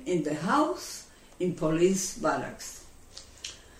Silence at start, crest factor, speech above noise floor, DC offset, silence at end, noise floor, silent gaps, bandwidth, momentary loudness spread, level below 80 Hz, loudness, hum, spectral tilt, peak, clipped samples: 0 s; 18 dB; 21 dB; under 0.1%; 0 s; -49 dBFS; none; 16 kHz; 21 LU; -54 dBFS; -29 LUFS; none; -4.5 dB/octave; -12 dBFS; under 0.1%